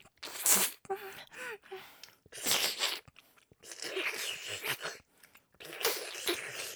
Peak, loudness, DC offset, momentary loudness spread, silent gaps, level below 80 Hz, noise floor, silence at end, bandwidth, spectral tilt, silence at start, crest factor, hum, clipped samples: -4 dBFS; -33 LUFS; under 0.1%; 22 LU; none; -76 dBFS; -63 dBFS; 0 s; over 20 kHz; 0 dB/octave; 0.05 s; 34 dB; none; under 0.1%